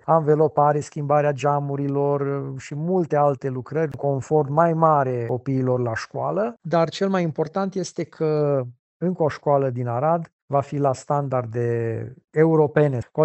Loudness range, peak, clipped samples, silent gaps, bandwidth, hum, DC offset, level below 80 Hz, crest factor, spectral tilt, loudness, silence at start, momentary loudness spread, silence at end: 2 LU; -4 dBFS; under 0.1%; 8.79-9.00 s, 10.33-10.48 s; 8.4 kHz; none; under 0.1%; -62 dBFS; 18 dB; -7.5 dB/octave; -22 LUFS; 0.05 s; 9 LU; 0 s